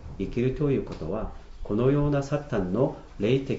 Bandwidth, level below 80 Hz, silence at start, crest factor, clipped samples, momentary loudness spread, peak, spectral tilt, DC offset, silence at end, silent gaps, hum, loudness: 7.8 kHz; -40 dBFS; 0 s; 16 dB; under 0.1%; 9 LU; -10 dBFS; -8.5 dB/octave; under 0.1%; 0 s; none; none; -27 LUFS